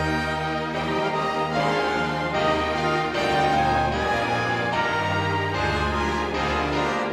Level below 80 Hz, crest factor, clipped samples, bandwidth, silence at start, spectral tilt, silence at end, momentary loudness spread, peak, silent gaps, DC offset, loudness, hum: -40 dBFS; 14 dB; under 0.1%; 15 kHz; 0 s; -5 dB/octave; 0 s; 3 LU; -10 dBFS; none; under 0.1%; -23 LUFS; none